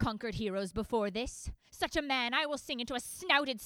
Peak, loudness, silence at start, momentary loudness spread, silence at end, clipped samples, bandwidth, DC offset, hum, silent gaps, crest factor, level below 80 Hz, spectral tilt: -12 dBFS; -34 LUFS; 0 s; 9 LU; 0 s; under 0.1%; 20 kHz; under 0.1%; none; none; 24 dB; -52 dBFS; -3.5 dB/octave